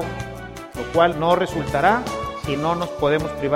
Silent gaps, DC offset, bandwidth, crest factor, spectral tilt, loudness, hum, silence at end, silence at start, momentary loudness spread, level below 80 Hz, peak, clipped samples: none; under 0.1%; 16.5 kHz; 18 dB; -5.5 dB/octave; -21 LUFS; none; 0 s; 0 s; 13 LU; -42 dBFS; -2 dBFS; under 0.1%